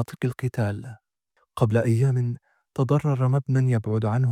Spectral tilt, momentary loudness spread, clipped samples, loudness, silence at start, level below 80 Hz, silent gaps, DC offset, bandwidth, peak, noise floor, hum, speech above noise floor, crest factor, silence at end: -8.5 dB/octave; 14 LU; under 0.1%; -24 LUFS; 0 s; -60 dBFS; none; under 0.1%; 11.5 kHz; -8 dBFS; -70 dBFS; none; 48 dB; 16 dB; 0 s